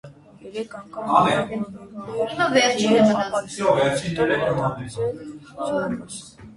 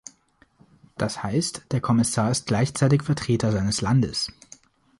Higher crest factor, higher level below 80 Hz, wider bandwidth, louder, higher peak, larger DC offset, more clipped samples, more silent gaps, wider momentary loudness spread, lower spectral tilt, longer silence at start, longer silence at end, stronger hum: about the same, 20 dB vs 16 dB; second, -54 dBFS vs -48 dBFS; about the same, 11.5 kHz vs 11.5 kHz; first, -21 LUFS vs -24 LUFS; first, -2 dBFS vs -8 dBFS; neither; neither; neither; first, 16 LU vs 8 LU; about the same, -5 dB/octave vs -5.5 dB/octave; second, 0.05 s vs 1 s; second, 0 s vs 0.7 s; neither